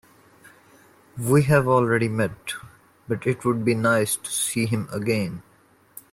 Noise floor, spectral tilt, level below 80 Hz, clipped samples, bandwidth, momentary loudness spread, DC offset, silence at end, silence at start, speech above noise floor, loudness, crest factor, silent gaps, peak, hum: -54 dBFS; -5.5 dB/octave; -58 dBFS; under 0.1%; 16.5 kHz; 15 LU; under 0.1%; 0.7 s; 1.15 s; 32 dB; -23 LUFS; 18 dB; none; -6 dBFS; none